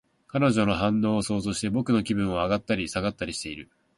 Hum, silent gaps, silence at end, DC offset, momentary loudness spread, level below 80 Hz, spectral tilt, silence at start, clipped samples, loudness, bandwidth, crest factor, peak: none; none; 0.35 s; under 0.1%; 9 LU; -50 dBFS; -5.5 dB/octave; 0.35 s; under 0.1%; -26 LUFS; 11.5 kHz; 16 dB; -10 dBFS